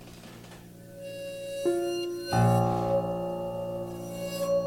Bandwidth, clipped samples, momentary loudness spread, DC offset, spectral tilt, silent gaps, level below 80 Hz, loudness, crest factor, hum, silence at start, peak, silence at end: 17 kHz; under 0.1%; 22 LU; under 0.1%; -6.5 dB/octave; none; -54 dBFS; -30 LUFS; 18 dB; none; 0 s; -12 dBFS; 0 s